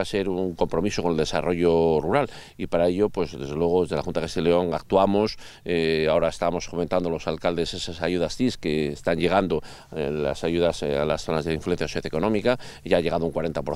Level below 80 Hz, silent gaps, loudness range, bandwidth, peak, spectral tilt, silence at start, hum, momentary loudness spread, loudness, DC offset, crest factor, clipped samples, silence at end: -44 dBFS; none; 2 LU; 14 kHz; -4 dBFS; -6 dB/octave; 0 s; none; 7 LU; -24 LUFS; under 0.1%; 20 dB; under 0.1%; 0 s